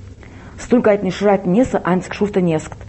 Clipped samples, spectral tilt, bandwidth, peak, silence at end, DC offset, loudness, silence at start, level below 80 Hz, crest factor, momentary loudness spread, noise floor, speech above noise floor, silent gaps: under 0.1%; -7 dB/octave; 8.4 kHz; -2 dBFS; 0.05 s; under 0.1%; -17 LUFS; 0 s; -42 dBFS; 16 dB; 5 LU; -37 dBFS; 21 dB; none